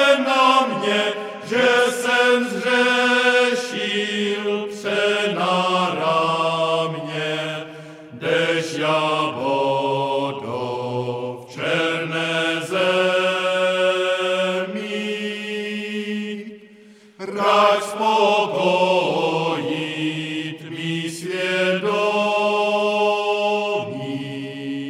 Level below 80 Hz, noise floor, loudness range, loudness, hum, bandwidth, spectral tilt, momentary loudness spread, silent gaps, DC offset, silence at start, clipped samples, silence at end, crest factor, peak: -76 dBFS; -47 dBFS; 5 LU; -20 LUFS; none; 15.5 kHz; -4 dB/octave; 12 LU; none; under 0.1%; 0 s; under 0.1%; 0 s; 18 dB; -2 dBFS